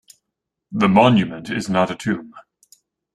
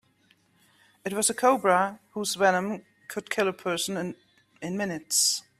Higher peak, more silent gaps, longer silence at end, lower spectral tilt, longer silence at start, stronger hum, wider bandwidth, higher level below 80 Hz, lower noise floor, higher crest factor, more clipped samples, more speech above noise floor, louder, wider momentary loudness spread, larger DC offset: first, -2 dBFS vs -8 dBFS; neither; first, 0.75 s vs 0.2 s; first, -6.5 dB/octave vs -2.5 dB/octave; second, 0.7 s vs 1.05 s; neither; second, 12 kHz vs 15.5 kHz; first, -56 dBFS vs -72 dBFS; first, -81 dBFS vs -65 dBFS; about the same, 18 dB vs 20 dB; neither; first, 63 dB vs 38 dB; first, -18 LUFS vs -26 LUFS; about the same, 13 LU vs 15 LU; neither